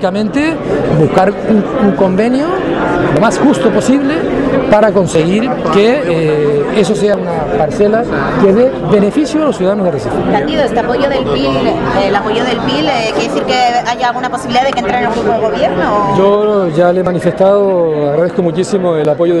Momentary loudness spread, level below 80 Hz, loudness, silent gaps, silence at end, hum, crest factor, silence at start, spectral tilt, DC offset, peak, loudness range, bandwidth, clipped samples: 4 LU; -36 dBFS; -11 LUFS; none; 0 s; none; 10 dB; 0 s; -6 dB/octave; under 0.1%; 0 dBFS; 2 LU; 12 kHz; under 0.1%